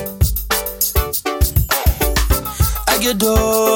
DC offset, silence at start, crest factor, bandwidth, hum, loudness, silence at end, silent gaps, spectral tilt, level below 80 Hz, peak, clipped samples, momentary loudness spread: under 0.1%; 0 s; 14 dB; 17 kHz; none; -16 LUFS; 0 s; none; -4 dB/octave; -20 dBFS; -2 dBFS; under 0.1%; 4 LU